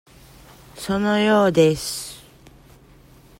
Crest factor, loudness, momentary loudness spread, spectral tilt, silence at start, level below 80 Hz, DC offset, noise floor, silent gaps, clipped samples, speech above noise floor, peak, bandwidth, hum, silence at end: 18 dB; -19 LUFS; 18 LU; -5 dB/octave; 0.75 s; -52 dBFS; under 0.1%; -49 dBFS; none; under 0.1%; 31 dB; -4 dBFS; 16.5 kHz; none; 1.2 s